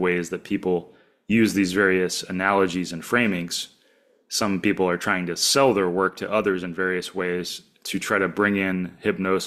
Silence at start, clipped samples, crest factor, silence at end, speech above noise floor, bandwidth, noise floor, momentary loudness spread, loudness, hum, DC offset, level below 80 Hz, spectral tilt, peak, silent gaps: 0 s; under 0.1%; 20 dB; 0 s; 38 dB; 16 kHz; -61 dBFS; 9 LU; -23 LUFS; none; under 0.1%; -60 dBFS; -4 dB/octave; -4 dBFS; none